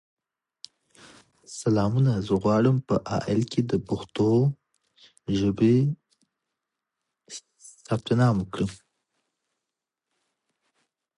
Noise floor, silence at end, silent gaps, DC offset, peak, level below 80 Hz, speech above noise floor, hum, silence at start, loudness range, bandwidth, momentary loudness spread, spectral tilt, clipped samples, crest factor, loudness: -86 dBFS; 2.45 s; none; under 0.1%; -8 dBFS; -54 dBFS; 63 dB; none; 1.5 s; 5 LU; 11 kHz; 19 LU; -7.5 dB/octave; under 0.1%; 18 dB; -25 LUFS